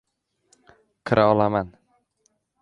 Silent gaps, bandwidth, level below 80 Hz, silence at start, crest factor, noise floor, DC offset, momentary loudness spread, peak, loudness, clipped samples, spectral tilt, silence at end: none; 9.6 kHz; -54 dBFS; 1.05 s; 22 dB; -70 dBFS; under 0.1%; 19 LU; -4 dBFS; -21 LUFS; under 0.1%; -8 dB/octave; 0.9 s